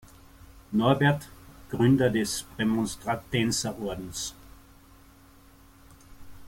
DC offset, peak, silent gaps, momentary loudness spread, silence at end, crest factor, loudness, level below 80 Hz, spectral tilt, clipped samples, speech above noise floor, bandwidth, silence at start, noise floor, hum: under 0.1%; -10 dBFS; none; 13 LU; 0 s; 20 dB; -27 LUFS; -52 dBFS; -5 dB/octave; under 0.1%; 28 dB; 16.5 kHz; 0.55 s; -54 dBFS; none